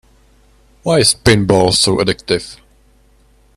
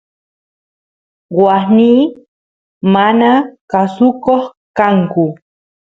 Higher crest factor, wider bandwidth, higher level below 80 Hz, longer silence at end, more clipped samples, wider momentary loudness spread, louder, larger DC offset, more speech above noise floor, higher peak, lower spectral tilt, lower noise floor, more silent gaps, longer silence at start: about the same, 16 dB vs 14 dB; first, 15.5 kHz vs 7.2 kHz; first, -38 dBFS vs -56 dBFS; first, 1.05 s vs 0.6 s; neither; about the same, 9 LU vs 9 LU; about the same, -13 LUFS vs -12 LUFS; neither; second, 38 dB vs over 80 dB; about the same, 0 dBFS vs 0 dBFS; second, -4 dB/octave vs -8.5 dB/octave; second, -50 dBFS vs under -90 dBFS; second, none vs 2.28-2.81 s, 3.61-3.68 s, 4.57-4.74 s; second, 0.85 s vs 1.3 s